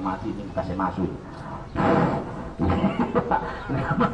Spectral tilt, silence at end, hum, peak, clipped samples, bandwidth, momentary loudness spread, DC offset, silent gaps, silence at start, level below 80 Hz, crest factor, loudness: -8.5 dB/octave; 0 s; none; -8 dBFS; under 0.1%; 9 kHz; 11 LU; under 0.1%; none; 0 s; -42 dBFS; 16 dB; -25 LUFS